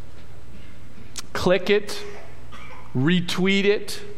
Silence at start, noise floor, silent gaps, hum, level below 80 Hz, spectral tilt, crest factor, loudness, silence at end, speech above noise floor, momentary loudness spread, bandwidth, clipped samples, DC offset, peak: 0.1 s; -45 dBFS; none; none; -50 dBFS; -5 dB/octave; 18 dB; -22 LUFS; 0 s; 23 dB; 22 LU; 16 kHz; under 0.1%; 5%; -6 dBFS